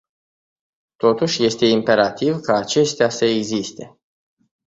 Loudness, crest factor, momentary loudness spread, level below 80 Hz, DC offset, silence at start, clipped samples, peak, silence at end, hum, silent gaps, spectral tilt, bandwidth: -18 LUFS; 18 dB; 8 LU; -60 dBFS; under 0.1%; 1 s; under 0.1%; -2 dBFS; 0.8 s; none; none; -4.5 dB/octave; 8 kHz